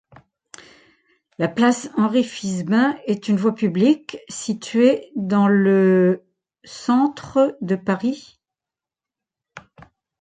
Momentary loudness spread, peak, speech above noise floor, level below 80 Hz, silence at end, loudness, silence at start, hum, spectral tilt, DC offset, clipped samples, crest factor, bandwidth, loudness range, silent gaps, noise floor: 11 LU; -4 dBFS; 70 dB; -64 dBFS; 0.6 s; -19 LUFS; 1.4 s; none; -6.5 dB/octave; under 0.1%; under 0.1%; 16 dB; 9.4 kHz; 5 LU; none; -89 dBFS